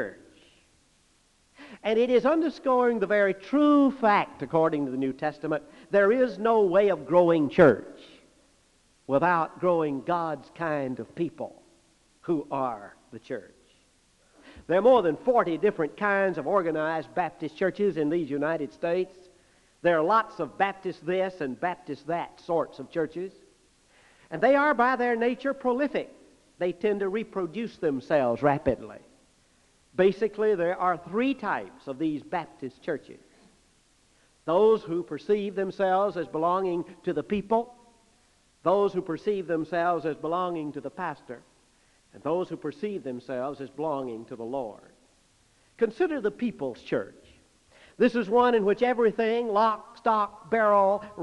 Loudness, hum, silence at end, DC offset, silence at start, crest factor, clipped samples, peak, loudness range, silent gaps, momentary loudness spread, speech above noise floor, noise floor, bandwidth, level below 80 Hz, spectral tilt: -26 LUFS; none; 0 s; under 0.1%; 0 s; 24 dB; under 0.1%; -4 dBFS; 9 LU; none; 13 LU; 39 dB; -65 dBFS; 11 kHz; -64 dBFS; -7 dB/octave